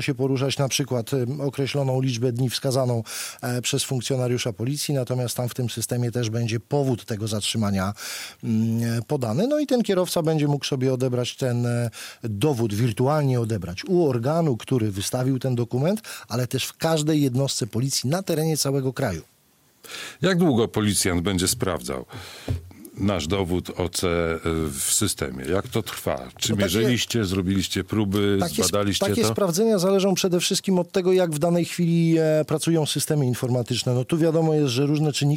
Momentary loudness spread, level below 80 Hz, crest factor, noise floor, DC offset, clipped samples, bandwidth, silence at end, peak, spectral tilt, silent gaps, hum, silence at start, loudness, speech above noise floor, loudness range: 7 LU; -50 dBFS; 16 dB; -60 dBFS; under 0.1%; under 0.1%; 16.5 kHz; 0 s; -8 dBFS; -5 dB/octave; none; none; 0 s; -23 LUFS; 37 dB; 4 LU